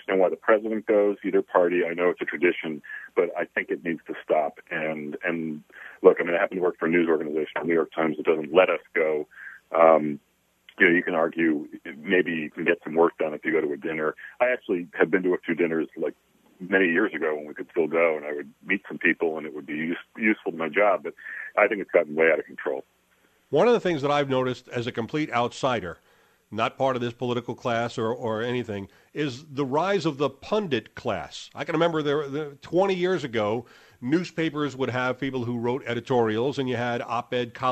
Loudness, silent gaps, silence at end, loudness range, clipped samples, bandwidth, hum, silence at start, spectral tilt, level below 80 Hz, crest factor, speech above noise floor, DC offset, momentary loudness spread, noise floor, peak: -25 LUFS; none; 0 s; 5 LU; under 0.1%; 12.5 kHz; none; 0.1 s; -6.5 dB/octave; -66 dBFS; 24 dB; 39 dB; under 0.1%; 10 LU; -64 dBFS; -2 dBFS